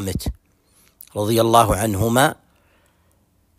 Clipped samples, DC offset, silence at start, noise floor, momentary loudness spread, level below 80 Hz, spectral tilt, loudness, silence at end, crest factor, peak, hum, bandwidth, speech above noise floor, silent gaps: under 0.1%; under 0.1%; 0 s; -61 dBFS; 14 LU; -38 dBFS; -5 dB/octave; -18 LUFS; 1.25 s; 20 dB; -2 dBFS; none; 16 kHz; 43 dB; none